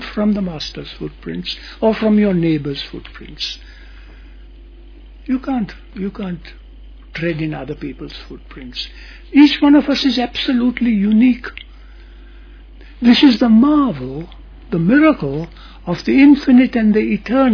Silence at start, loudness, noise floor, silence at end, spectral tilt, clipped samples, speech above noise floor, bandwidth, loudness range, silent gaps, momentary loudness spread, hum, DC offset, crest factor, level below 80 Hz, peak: 0 s; -15 LUFS; -38 dBFS; 0 s; -7 dB/octave; under 0.1%; 23 dB; 5.4 kHz; 12 LU; none; 21 LU; none; under 0.1%; 16 dB; -38 dBFS; 0 dBFS